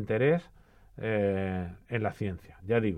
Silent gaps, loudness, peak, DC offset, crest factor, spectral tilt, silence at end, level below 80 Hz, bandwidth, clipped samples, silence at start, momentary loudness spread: none; -31 LUFS; -14 dBFS; under 0.1%; 18 dB; -9 dB/octave; 0 s; -58 dBFS; 10 kHz; under 0.1%; 0 s; 10 LU